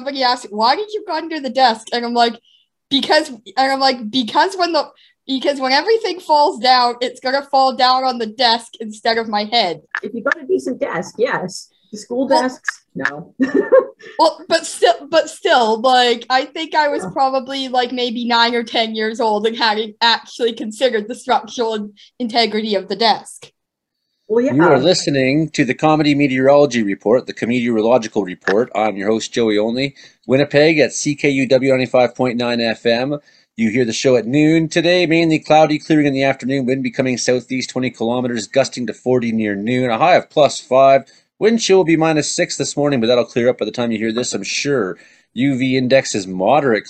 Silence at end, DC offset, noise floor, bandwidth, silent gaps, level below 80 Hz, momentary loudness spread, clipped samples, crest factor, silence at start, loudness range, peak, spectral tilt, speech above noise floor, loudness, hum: 0 s; under 0.1%; -76 dBFS; 12 kHz; none; -60 dBFS; 9 LU; under 0.1%; 16 dB; 0 s; 4 LU; 0 dBFS; -4.5 dB/octave; 60 dB; -16 LUFS; none